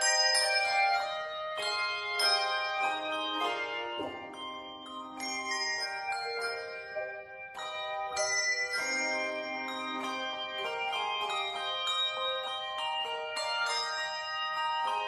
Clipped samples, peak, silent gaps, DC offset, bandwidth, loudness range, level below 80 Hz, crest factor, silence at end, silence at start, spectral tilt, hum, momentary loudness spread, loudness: under 0.1%; -16 dBFS; none; under 0.1%; 15.5 kHz; 5 LU; -74 dBFS; 18 dB; 0 s; 0 s; 0.5 dB/octave; none; 12 LU; -32 LUFS